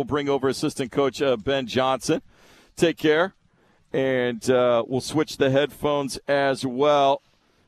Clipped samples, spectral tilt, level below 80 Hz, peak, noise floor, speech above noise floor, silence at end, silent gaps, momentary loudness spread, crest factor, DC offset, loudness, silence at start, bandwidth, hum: under 0.1%; -5 dB/octave; -56 dBFS; -6 dBFS; -61 dBFS; 38 dB; 0.5 s; none; 7 LU; 16 dB; under 0.1%; -23 LUFS; 0 s; 14 kHz; none